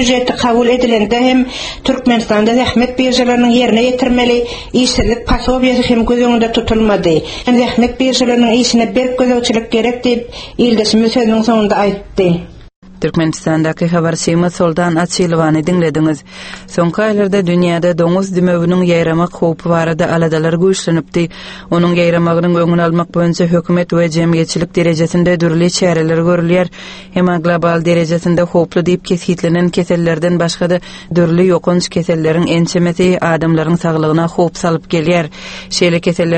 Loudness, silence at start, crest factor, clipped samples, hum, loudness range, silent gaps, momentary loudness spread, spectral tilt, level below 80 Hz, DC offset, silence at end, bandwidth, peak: -12 LUFS; 0 s; 12 dB; under 0.1%; none; 2 LU; 12.76-12.82 s; 4 LU; -5.5 dB/octave; -34 dBFS; under 0.1%; 0 s; 8.8 kHz; 0 dBFS